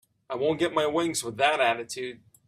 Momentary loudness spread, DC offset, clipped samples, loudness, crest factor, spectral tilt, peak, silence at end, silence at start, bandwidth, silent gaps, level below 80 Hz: 13 LU; under 0.1%; under 0.1%; -26 LUFS; 20 dB; -3.5 dB/octave; -8 dBFS; 0.3 s; 0.3 s; 15.5 kHz; none; -68 dBFS